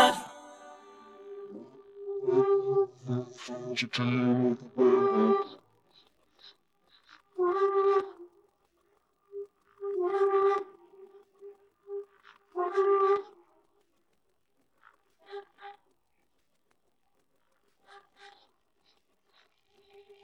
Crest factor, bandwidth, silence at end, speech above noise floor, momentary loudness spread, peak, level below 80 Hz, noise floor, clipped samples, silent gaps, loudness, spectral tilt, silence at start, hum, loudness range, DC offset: 26 dB; 12 kHz; 2.25 s; 50 dB; 24 LU; -6 dBFS; -80 dBFS; -77 dBFS; under 0.1%; none; -28 LUFS; -6 dB/octave; 0 s; none; 5 LU; under 0.1%